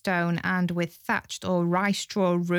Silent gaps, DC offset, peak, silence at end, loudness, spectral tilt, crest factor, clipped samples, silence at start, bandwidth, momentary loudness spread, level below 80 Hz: none; under 0.1%; -12 dBFS; 0 s; -26 LUFS; -5.5 dB/octave; 14 dB; under 0.1%; 0.05 s; 15 kHz; 4 LU; -64 dBFS